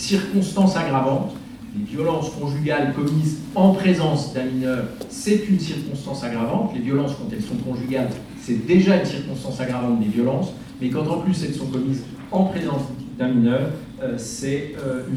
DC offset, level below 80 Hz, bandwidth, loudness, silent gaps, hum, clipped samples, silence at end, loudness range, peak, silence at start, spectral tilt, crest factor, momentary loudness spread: under 0.1%; -50 dBFS; 13.5 kHz; -22 LUFS; none; none; under 0.1%; 0 s; 3 LU; -4 dBFS; 0 s; -6.5 dB/octave; 18 dB; 10 LU